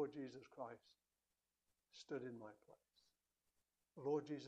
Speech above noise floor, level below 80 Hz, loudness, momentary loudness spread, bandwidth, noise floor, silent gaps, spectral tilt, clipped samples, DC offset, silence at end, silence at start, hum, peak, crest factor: over 40 dB; under -90 dBFS; -50 LUFS; 21 LU; 9 kHz; under -90 dBFS; none; -6.5 dB/octave; under 0.1%; under 0.1%; 0 s; 0 s; 60 Hz at -85 dBFS; -32 dBFS; 20 dB